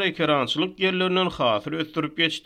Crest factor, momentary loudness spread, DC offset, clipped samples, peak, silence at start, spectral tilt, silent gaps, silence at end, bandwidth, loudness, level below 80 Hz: 18 dB; 6 LU; under 0.1%; under 0.1%; -6 dBFS; 0 s; -5 dB/octave; none; 0.05 s; 13.5 kHz; -23 LUFS; -58 dBFS